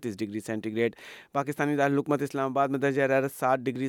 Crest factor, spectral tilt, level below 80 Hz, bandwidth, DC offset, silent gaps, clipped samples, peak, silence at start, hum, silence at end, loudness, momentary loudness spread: 16 dB; -6.5 dB/octave; -76 dBFS; 18 kHz; under 0.1%; none; under 0.1%; -12 dBFS; 0 s; none; 0 s; -28 LUFS; 8 LU